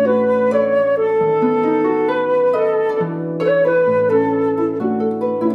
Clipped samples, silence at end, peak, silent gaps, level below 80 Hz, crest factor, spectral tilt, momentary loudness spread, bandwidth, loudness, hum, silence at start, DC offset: under 0.1%; 0 s; -4 dBFS; none; -64 dBFS; 12 dB; -8.5 dB/octave; 5 LU; 5.8 kHz; -17 LUFS; none; 0 s; under 0.1%